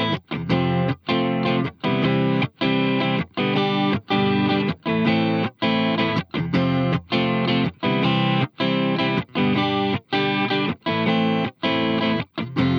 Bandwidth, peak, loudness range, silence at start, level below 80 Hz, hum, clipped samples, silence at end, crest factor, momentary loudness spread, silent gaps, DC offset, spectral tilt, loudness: 6.6 kHz; -8 dBFS; 1 LU; 0 s; -54 dBFS; none; under 0.1%; 0 s; 14 dB; 3 LU; none; under 0.1%; -8 dB/octave; -21 LUFS